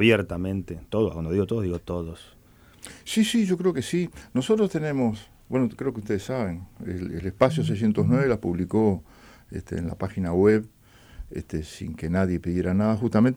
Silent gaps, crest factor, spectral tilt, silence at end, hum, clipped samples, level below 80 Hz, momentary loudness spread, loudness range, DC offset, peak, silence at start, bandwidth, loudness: none; 18 dB; -6.5 dB/octave; 0 s; none; under 0.1%; -48 dBFS; 14 LU; 2 LU; under 0.1%; -6 dBFS; 0 s; 16 kHz; -25 LUFS